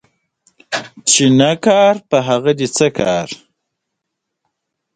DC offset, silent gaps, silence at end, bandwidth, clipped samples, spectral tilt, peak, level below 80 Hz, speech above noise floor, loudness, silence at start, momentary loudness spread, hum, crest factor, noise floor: under 0.1%; none; 1.6 s; 9.6 kHz; under 0.1%; -4 dB/octave; 0 dBFS; -54 dBFS; 63 dB; -14 LUFS; 0.7 s; 13 LU; none; 16 dB; -77 dBFS